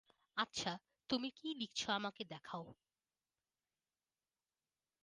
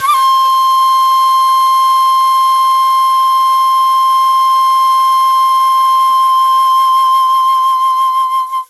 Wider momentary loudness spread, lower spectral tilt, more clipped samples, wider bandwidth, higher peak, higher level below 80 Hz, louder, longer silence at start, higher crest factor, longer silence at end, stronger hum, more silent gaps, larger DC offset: first, 11 LU vs 1 LU; first, -3 dB/octave vs 3.5 dB/octave; neither; second, 11 kHz vs 14.5 kHz; second, -22 dBFS vs -2 dBFS; second, -80 dBFS vs -70 dBFS; second, -43 LUFS vs -9 LUFS; first, 0.35 s vs 0 s; first, 24 dB vs 6 dB; first, 2.3 s vs 0.05 s; neither; neither; neither